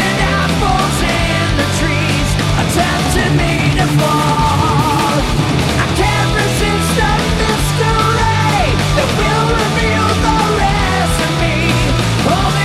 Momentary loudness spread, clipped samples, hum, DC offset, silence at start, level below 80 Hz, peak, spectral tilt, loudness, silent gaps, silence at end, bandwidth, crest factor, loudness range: 2 LU; under 0.1%; none; under 0.1%; 0 s; -22 dBFS; 0 dBFS; -5 dB/octave; -13 LUFS; none; 0 s; 15.5 kHz; 12 dB; 1 LU